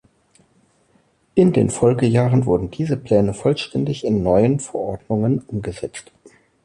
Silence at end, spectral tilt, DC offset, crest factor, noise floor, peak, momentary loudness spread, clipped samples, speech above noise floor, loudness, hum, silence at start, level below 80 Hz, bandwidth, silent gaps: 0.35 s; -7 dB/octave; under 0.1%; 16 dB; -60 dBFS; -2 dBFS; 11 LU; under 0.1%; 42 dB; -19 LUFS; none; 1.35 s; -44 dBFS; 11 kHz; none